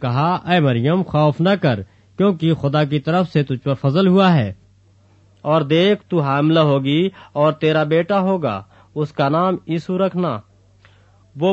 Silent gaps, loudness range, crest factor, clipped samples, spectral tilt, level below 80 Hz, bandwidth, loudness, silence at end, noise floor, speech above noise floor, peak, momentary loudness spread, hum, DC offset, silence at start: none; 3 LU; 14 dB; under 0.1%; -8.5 dB/octave; -56 dBFS; 7.6 kHz; -18 LUFS; 0 s; -52 dBFS; 36 dB; -4 dBFS; 9 LU; none; under 0.1%; 0 s